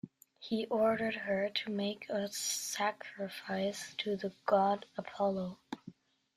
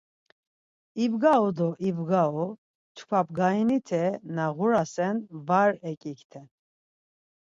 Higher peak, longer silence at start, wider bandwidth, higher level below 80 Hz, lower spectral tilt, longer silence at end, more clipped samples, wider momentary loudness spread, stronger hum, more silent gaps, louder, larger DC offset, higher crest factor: second, -16 dBFS vs -8 dBFS; second, 0.05 s vs 0.95 s; first, 15.5 kHz vs 7.8 kHz; about the same, -76 dBFS vs -72 dBFS; second, -3.5 dB/octave vs -7 dB/octave; second, 0.45 s vs 1.1 s; neither; about the same, 13 LU vs 13 LU; neither; second, none vs 2.58-2.95 s, 5.97-6.01 s, 6.24-6.30 s; second, -35 LUFS vs -26 LUFS; neither; about the same, 20 dB vs 18 dB